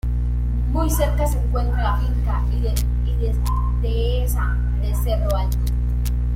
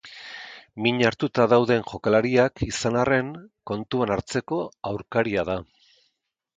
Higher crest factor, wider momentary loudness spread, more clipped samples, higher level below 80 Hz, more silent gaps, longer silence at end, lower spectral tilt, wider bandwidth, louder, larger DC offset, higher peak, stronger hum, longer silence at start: second, 12 dB vs 20 dB; second, 3 LU vs 17 LU; neither; first, -20 dBFS vs -50 dBFS; neither; second, 0 s vs 0.95 s; about the same, -6.5 dB/octave vs -5.5 dB/octave; first, 16 kHz vs 9.4 kHz; about the same, -22 LUFS vs -24 LUFS; neither; about the same, -6 dBFS vs -4 dBFS; first, 60 Hz at -20 dBFS vs none; about the same, 0.05 s vs 0.05 s